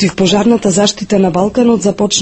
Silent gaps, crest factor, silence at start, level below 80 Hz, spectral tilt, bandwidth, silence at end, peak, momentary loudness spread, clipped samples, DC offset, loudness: none; 12 dB; 0 s; -42 dBFS; -4.5 dB/octave; 8.8 kHz; 0 s; 0 dBFS; 2 LU; under 0.1%; under 0.1%; -11 LUFS